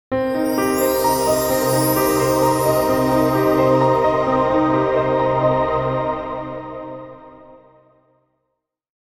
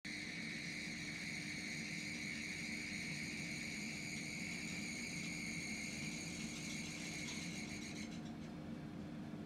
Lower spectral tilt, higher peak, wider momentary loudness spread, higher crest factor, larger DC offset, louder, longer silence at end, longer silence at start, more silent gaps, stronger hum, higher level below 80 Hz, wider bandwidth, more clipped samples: first, -5.5 dB/octave vs -3 dB/octave; first, -4 dBFS vs -34 dBFS; first, 12 LU vs 6 LU; about the same, 14 dB vs 14 dB; neither; first, -17 LUFS vs -45 LUFS; first, 1.5 s vs 0 s; about the same, 0.1 s vs 0.05 s; neither; neither; first, -44 dBFS vs -68 dBFS; first, 18 kHz vs 16 kHz; neither